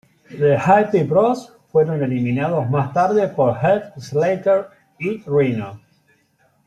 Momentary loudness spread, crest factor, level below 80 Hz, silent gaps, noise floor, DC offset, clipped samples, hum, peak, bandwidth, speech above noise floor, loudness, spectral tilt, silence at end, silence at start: 11 LU; 16 dB; -60 dBFS; none; -61 dBFS; under 0.1%; under 0.1%; none; -2 dBFS; 10.5 kHz; 43 dB; -18 LUFS; -8 dB/octave; 0.9 s; 0.3 s